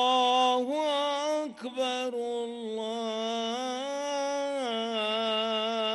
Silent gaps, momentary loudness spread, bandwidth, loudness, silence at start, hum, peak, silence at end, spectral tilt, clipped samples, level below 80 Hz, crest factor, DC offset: none; 9 LU; 12 kHz; -29 LUFS; 0 s; none; -16 dBFS; 0 s; -2.5 dB/octave; under 0.1%; -78 dBFS; 14 dB; under 0.1%